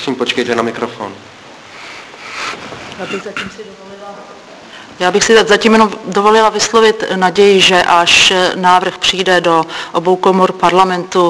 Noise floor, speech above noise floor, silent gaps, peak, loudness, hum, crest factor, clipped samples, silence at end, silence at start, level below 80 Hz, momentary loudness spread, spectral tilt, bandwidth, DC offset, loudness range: -35 dBFS; 23 dB; none; 0 dBFS; -10 LUFS; none; 12 dB; 0.3%; 0 s; 0 s; -48 dBFS; 22 LU; -3 dB/octave; 11 kHz; under 0.1%; 16 LU